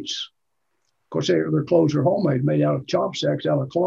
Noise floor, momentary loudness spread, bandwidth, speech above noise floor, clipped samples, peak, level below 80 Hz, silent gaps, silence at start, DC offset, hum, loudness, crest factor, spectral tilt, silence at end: -77 dBFS; 10 LU; 7.6 kHz; 57 dB; under 0.1%; -6 dBFS; -62 dBFS; none; 0 s; under 0.1%; none; -22 LUFS; 16 dB; -6.5 dB/octave; 0 s